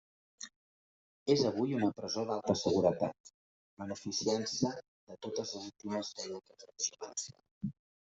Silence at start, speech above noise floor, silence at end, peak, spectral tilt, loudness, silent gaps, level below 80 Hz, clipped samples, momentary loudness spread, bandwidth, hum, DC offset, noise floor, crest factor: 0.4 s; over 55 dB; 0.35 s; -14 dBFS; -4.5 dB/octave; -35 LUFS; 0.56-1.26 s, 3.20-3.24 s, 3.34-3.77 s, 4.88-5.07 s, 7.51-7.61 s; -74 dBFS; under 0.1%; 18 LU; 8.2 kHz; none; under 0.1%; under -90 dBFS; 22 dB